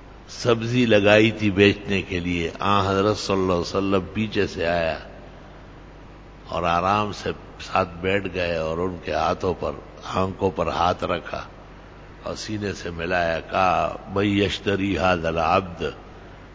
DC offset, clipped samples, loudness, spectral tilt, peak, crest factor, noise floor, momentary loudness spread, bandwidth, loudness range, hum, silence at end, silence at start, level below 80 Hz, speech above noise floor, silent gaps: under 0.1%; under 0.1%; -23 LUFS; -5.5 dB/octave; 0 dBFS; 22 dB; -43 dBFS; 14 LU; 8 kHz; 7 LU; 50 Hz at -45 dBFS; 0 s; 0 s; -42 dBFS; 21 dB; none